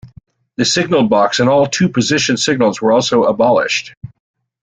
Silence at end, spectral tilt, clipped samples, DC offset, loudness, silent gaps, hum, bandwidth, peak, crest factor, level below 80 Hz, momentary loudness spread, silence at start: 0.55 s; -4 dB/octave; under 0.1%; under 0.1%; -13 LUFS; 3.97-4.01 s; none; 9.6 kHz; 0 dBFS; 14 dB; -52 dBFS; 6 LU; 0.05 s